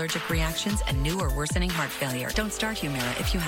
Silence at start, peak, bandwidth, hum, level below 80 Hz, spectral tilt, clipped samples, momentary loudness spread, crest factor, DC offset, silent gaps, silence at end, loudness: 0 s; -14 dBFS; 17 kHz; none; -32 dBFS; -4 dB/octave; under 0.1%; 2 LU; 14 dB; under 0.1%; none; 0 s; -27 LUFS